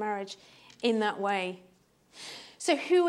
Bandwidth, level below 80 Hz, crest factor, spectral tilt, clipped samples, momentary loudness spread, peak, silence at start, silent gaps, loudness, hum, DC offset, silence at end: 12 kHz; -80 dBFS; 18 dB; -4 dB/octave; under 0.1%; 17 LU; -12 dBFS; 0 s; none; -30 LUFS; none; under 0.1%; 0 s